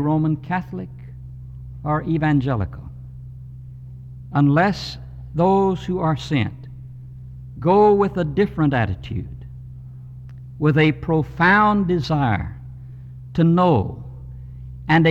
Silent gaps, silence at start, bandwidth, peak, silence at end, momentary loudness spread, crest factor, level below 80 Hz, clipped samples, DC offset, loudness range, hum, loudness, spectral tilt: none; 0 s; 7.8 kHz; -4 dBFS; 0 s; 22 LU; 16 dB; -42 dBFS; under 0.1%; under 0.1%; 5 LU; none; -19 LUFS; -8 dB/octave